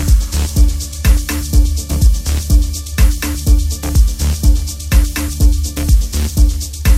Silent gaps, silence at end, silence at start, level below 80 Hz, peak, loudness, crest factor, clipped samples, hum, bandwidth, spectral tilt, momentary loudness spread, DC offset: none; 0 s; 0 s; -12 dBFS; 0 dBFS; -15 LUFS; 12 dB; under 0.1%; none; 16 kHz; -4.5 dB/octave; 3 LU; under 0.1%